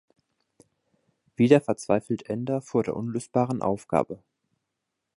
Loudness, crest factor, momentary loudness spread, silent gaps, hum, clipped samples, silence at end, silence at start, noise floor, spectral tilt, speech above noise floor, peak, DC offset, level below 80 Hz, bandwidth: -26 LUFS; 22 dB; 11 LU; none; none; under 0.1%; 1 s; 1.4 s; -83 dBFS; -7 dB/octave; 58 dB; -4 dBFS; under 0.1%; -62 dBFS; 11.5 kHz